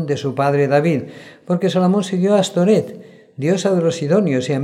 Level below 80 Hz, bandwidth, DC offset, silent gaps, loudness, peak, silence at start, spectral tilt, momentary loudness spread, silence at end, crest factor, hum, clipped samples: -66 dBFS; 12 kHz; under 0.1%; none; -17 LUFS; -4 dBFS; 0 s; -6.5 dB/octave; 8 LU; 0 s; 14 dB; none; under 0.1%